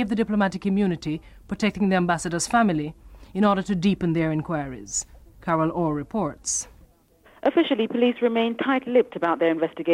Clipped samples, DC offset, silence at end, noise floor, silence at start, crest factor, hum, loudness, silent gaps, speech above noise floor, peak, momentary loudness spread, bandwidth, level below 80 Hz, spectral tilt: under 0.1%; under 0.1%; 0 s; -56 dBFS; 0 s; 16 dB; none; -24 LUFS; none; 33 dB; -8 dBFS; 8 LU; 13 kHz; -50 dBFS; -5 dB/octave